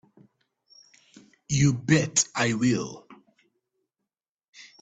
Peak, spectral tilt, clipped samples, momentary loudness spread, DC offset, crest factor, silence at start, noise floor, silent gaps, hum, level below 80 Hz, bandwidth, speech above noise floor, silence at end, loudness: -8 dBFS; -4.5 dB/octave; under 0.1%; 11 LU; under 0.1%; 22 dB; 1.5 s; -87 dBFS; none; none; -58 dBFS; 9.2 kHz; 63 dB; 1.65 s; -24 LUFS